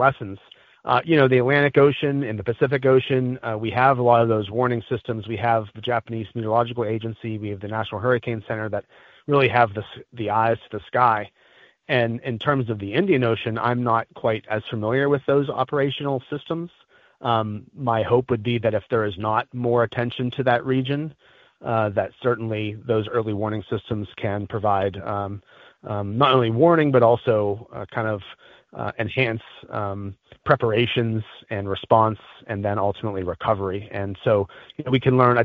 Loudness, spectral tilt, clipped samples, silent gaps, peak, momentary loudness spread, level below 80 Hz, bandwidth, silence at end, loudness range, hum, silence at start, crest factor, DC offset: -22 LUFS; -5 dB/octave; under 0.1%; none; 0 dBFS; 14 LU; -56 dBFS; 5 kHz; 0 s; 5 LU; none; 0 s; 22 dB; under 0.1%